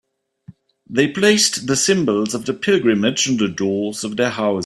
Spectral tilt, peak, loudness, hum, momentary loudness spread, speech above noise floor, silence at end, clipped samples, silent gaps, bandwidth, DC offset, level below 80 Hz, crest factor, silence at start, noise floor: -3.5 dB/octave; -2 dBFS; -17 LUFS; none; 8 LU; 28 dB; 0 s; under 0.1%; none; 14 kHz; under 0.1%; -58 dBFS; 18 dB; 0.5 s; -45 dBFS